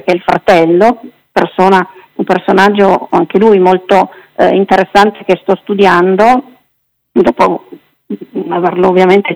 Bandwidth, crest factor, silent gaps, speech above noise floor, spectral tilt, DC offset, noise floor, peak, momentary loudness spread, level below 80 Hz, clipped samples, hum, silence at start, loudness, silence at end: 13 kHz; 10 dB; none; 54 dB; -6.5 dB/octave; under 0.1%; -63 dBFS; 0 dBFS; 10 LU; -46 dBFS; 1%; none; 0.05 s; -9 LUFS; 0 s